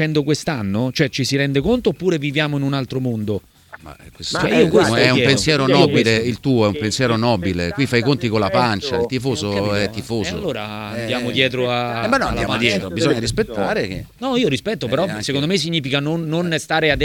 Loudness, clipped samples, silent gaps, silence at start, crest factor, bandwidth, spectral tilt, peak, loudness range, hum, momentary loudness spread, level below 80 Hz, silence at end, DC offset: -18 LUFS; under 0.1%; none; 0 s; 18 dB; 18 kHz; -5 dB/octave; 0 dBFS; 5 LU; none; 9 LU; -42 dBFS; 0 s; under 0.1%